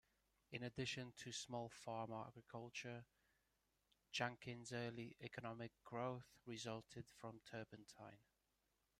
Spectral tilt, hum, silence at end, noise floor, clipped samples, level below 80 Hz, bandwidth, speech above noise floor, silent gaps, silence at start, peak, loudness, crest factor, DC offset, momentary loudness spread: -4.5 dB/octave; none; 0.8 s; -87 dBFS; under 0.1%; -82 dBFS; 15 kHz; 35 dB; none; 0.5 s; -28 dBFS; -52 LUFS; 26 dB; under 0.1%; 10 LU